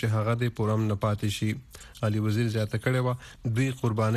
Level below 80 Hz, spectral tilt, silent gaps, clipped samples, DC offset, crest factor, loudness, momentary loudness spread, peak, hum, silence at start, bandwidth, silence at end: -54 dBFS; -6.5 dB/octave; none; under 0.1%; under 0.1%; 14 dB; -28 LUFS; 5 LU; -12 dBFS; none; 0 s; 13.5 kHz; 0 s